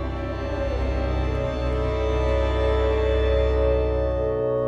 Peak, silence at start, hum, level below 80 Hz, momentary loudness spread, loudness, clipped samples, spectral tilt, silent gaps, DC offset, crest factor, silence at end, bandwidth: -10 dBFS; 0 s; none; -26 dBFS; 5 LU; -24 LUFS; under 0.1%; -8 dB/octave; none; under 0.1%; 12 dB; 0 s; 6.4 kHz